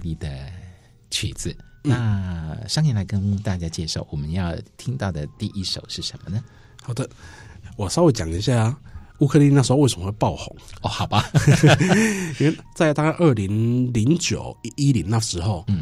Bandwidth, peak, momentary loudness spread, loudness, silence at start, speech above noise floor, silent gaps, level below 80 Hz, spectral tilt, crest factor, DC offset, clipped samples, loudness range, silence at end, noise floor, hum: 13.5 kHz; -4 dBFS; 15 LU; -21 LUFS; 0 s; 24 dB; none; -42 dBFS; -5.5 dB/octave; 16 dB; under 0.1%; under 0.1%; 9 LU; 0 s; -45 dBFS; none